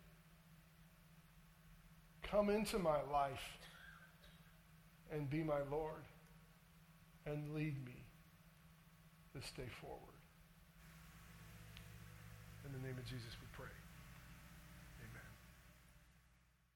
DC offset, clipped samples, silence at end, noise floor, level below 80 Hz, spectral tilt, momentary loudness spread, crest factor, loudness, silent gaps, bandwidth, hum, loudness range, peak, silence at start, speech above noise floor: under 0.1%; under 0.1%; 0.55 s; -74 dBFS; -66 dBFS; -6 dB/octave; 27 LU; 24 dB; -46 LUFS; none; 19.5 kHz; none; 14 LU; -26 dBFS; 0 s; 30 dB